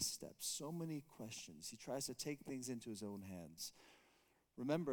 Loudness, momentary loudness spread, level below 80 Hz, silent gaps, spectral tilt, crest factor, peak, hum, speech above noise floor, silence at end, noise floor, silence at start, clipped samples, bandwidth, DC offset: -48 LUFS; 9 LU; -78 dBFS; none; -3.5 dB/octave; 22 dB; -24 dBFS; none; 29 dB; 0 s; -77 dBFS; 0 s; under 0.1%; 19 kHz; under 0.1%